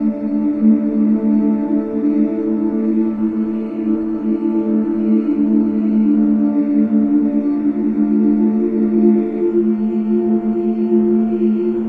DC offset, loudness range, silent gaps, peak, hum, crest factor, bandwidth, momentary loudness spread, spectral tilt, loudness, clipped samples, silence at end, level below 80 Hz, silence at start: under 0.1%; 2 LU; none; -2 dBFS; none; 14 dB; 3 kHz; 5 LU; -11.5 dB/octave; -16 LUFS; under 0.1%; 0 s; -52 dBFS; 0 s